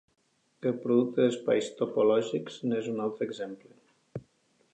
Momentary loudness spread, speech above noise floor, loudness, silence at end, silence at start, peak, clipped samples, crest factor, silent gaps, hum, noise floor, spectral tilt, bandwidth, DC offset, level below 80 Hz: 20 LU; 40 dB; -29 LUFS; 0.55 s; 0.6 s; -12 dBFS; under 0.1%; 18 dB; none; none; -69 dBFS; -6 dB/octave; 9 kHz; under 0.1%; -78 dBFS